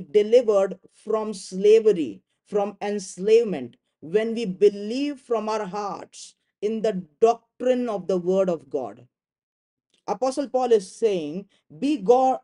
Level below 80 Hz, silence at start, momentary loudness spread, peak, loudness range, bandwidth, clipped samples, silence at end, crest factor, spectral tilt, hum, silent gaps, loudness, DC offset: -72 dBFS; 0 s; 14 LU; -4 dBFS; 4 LU; 11 kHz; under 0.1%; 0.05 s; 20 dB; -5.5 dB/octave; none; 9.43-9.77 s; -23 LUFS; under 0.1%